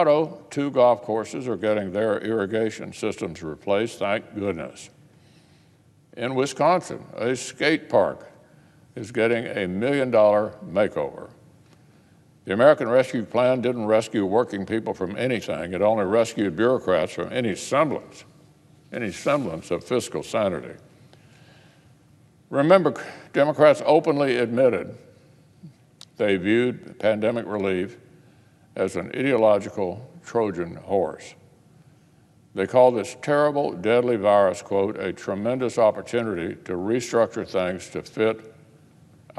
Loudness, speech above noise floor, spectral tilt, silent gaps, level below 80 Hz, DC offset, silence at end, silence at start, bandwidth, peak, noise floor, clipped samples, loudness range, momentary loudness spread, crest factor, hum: -23 LUFS; 34 dB; -5.5 dB/octave; none; -64 dBFS; under 0.1%; 0.85 s; 0 s; 12.5 kHz; -2 dBFS; -57 dBFS; under 0.1%; 6 LU; 12 LU; 22 dB; none